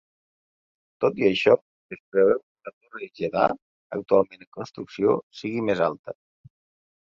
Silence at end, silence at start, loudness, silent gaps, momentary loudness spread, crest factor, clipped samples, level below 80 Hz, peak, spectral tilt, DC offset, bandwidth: 0.9 s; 1 s; -24 LUFS; 1.61-1.89 s, 2.00-2.12 s, 2.43-2.55 s, 2.73-2.81 s, 3.62-3.90 s, 4.47-4.52 s, 5.23-5.31 s, 5.99-6.04 s; 20 LU; 22 dB; under 0.1%; -64 dBFS; -4 dBFS; -6.5 dB/octave; under 0.1%; 7.2 kHz